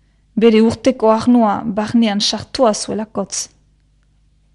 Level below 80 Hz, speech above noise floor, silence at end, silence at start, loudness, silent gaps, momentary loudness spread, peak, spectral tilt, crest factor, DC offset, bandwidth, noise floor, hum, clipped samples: -50 dBFS; 41 dB; 1.1 s; 0.35 s; -15 LUFS; none; 10 LU; 0 dBFS; -4.5 dB/octave; 16 dB; under 0.1%; 11 kHz; -55 dBFS; 50 Hz at -40 dBFS; under 0.1%